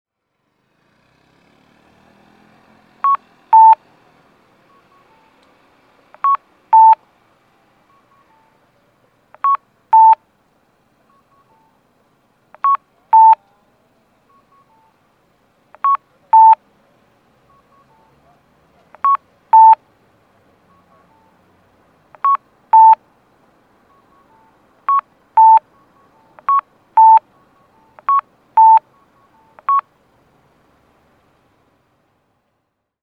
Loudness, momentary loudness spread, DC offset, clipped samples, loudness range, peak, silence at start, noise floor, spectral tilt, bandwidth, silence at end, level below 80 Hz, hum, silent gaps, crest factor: -12 LUFS; 12 LU; under 0.1%; under 0.1%; 4 LU; 0 dBFS; 3.05 s; -71 dBFS; -4.5 dB/octave; 3.6 kHz; 3.2 s; -72 dBFS; none; none; 16 dB